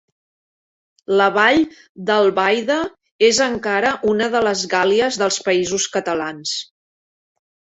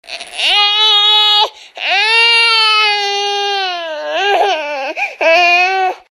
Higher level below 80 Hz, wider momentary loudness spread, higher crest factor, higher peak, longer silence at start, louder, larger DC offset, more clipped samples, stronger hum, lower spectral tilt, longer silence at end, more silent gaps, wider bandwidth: first, -56 dBFS vs -66 dBFS; second, 9 LU vs 12 LU; first, 18 dB vs 12 dB; about the same, -2 dBFS vs 0 dBFS; first, 1.1 s vs 0.05 s; second, -17 LUFS vs -10 LUFS; neither; neither; neither; first, -3 dB/octave vs 2 dB/octave; first, 1.1 s vs 0.15 s; first, 1.89-1.95 s, 3.11-3.19 s vs none; second, 8.4 kHz vs 15.5 kHz